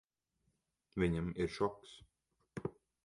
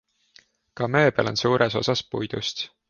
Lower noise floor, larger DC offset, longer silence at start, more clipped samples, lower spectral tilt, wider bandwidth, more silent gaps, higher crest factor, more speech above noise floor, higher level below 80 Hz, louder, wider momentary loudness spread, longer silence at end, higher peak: first, -83 dBFS vs -58 dBFS; neither; first, 0.95 s vs 0.75 s; neither; first, -7 dB/octave vs -5 dB/octave; first, 11.5 kHz vs 7.2 kHz; neither; about the same, 20 dB vs 18 dB; first, 45 dB vs 34 dB; about the same, -58 dBFS vs -58 dBFS; second, -39 LUFS vs -23 LUFS; first, 20 LU vs 9 LU; first, 0.35 s vs 0.2 s; second, -20 dBFS vs -6 dBFS